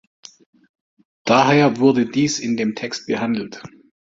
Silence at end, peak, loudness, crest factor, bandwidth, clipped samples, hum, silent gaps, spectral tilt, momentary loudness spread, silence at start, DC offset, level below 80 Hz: 0.45 s; -2 dBFS; -18 LUFS; 18 dB; 7.8 kHz; under 0.1%; none; none; -5 dB/octave; 14 LU; 1.25 s; under 0.1%; -60 dBFS